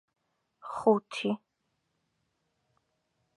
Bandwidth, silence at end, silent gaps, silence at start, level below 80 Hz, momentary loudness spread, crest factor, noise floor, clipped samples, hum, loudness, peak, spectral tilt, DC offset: 11.5 kHz; 2 s; none; 0.65 s; -78 dBFS; 15 LU; 24 dB; -80 dBFS; under 0.1%; none; -30 LUFS; -10 dBFS; -6 dB/octave; under 0.1%